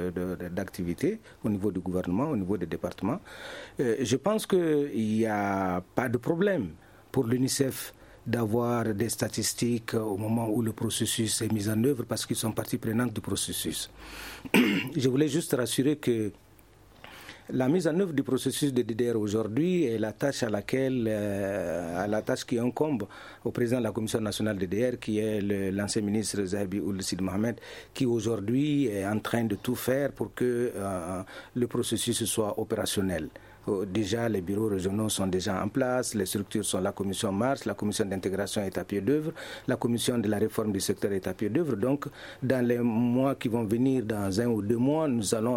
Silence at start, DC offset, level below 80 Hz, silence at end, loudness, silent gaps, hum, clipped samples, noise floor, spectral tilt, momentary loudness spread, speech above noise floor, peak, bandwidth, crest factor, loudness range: 0 s; under 0.1%; -60 dBFS; 0 s; -29 LUFS; none; none; under 0.1%; -56 dBFS; -5 dB/octave; 7 LU; 28 dB; -8 dBFS; 16.5 kHz; 20 dB; 2 LU